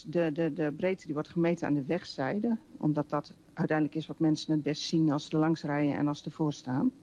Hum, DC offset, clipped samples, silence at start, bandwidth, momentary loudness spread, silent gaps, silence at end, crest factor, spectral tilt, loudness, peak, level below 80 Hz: none; under 0.1%; under 0.1%; 0.05 s; 9.6 kHz; 5 LU; none; 0.1 s; 14 dB; -7 dB/octave; -31 LUFS; -18 dBFS; -68 dBFS